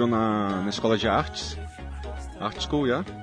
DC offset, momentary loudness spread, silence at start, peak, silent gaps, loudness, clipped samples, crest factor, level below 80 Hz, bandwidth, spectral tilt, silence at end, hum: under 0.1%; 14 LU; 0 s; -10 dBFS; none; -26 LUFS; under 0.1%; 18 dB; -40 dBFS; 10.5 kHz; -5.5 dB/octave; 0 s; none